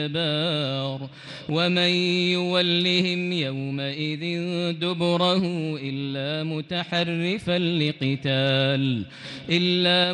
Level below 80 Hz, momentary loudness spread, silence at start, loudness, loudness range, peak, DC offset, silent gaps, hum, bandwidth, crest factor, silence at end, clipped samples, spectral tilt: -64 dBFS; 9 LU; 0 s; -23 LUFS; 3 LU; -8 dBFS; under 0.1%; none; none; 10 kHz; 16 dB; 0 s; under 0.1%; -6 dB/octave